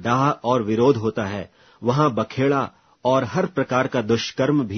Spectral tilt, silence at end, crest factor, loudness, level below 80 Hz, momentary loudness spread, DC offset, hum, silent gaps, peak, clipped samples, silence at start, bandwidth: -6.5 dB/octave; 0 s; 18 dB; -21 LUFS; -58 dBFS; 9 LU; under 0.1%; none; none; -4 dBFS; under 0.1%; 0 s; 6.6 kHz